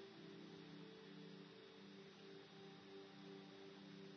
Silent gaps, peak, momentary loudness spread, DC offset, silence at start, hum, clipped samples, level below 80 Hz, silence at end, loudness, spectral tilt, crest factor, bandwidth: none; -46 dBFS; 2 LU; under 0.1%; 0 s; none; under 0.1%; under -90 dBFS; 0 s; -60 LUFS; -4 dB/octave; 12 dB; 6.4 kHz